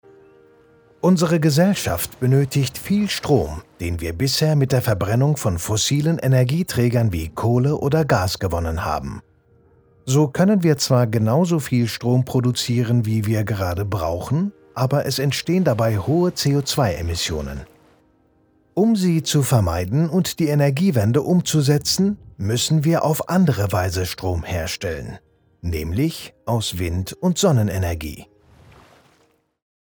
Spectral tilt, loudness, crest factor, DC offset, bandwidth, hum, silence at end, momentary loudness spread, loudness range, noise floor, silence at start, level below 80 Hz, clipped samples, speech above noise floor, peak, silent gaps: -5.5 dB/octave; -20 LUFS; 18 dB; under 0.1%; over 20 kHz; none; 1.6 s; 8 LU; 4 LU; -61 dBFS; 1.05 s; -40 dBFS; under 0.1%; 42 dB; -2 dBFS; none